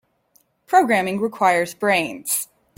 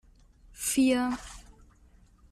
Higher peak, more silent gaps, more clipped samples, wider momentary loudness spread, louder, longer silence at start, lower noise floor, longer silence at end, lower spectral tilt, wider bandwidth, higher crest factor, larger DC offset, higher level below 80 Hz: first, -4 dBFS vs -14 dBFS; neither; neither; second, 7 LU vs 23 LU; first, -19 LUFS vs -28 LUFS; about the same, 0.7 s vs 0.6 s; about the same, -62 dBFS vs -59 dBFS; second, 0.35 s vs 0.9 s; about the same, -3.5 dB/octave vs -2.5 dB/octave; about the same, 16.5 kHz vs 15 kHz; about the same, 18 dB vs 16 dB; neither; second, -66 dBFS vs -54 dBFS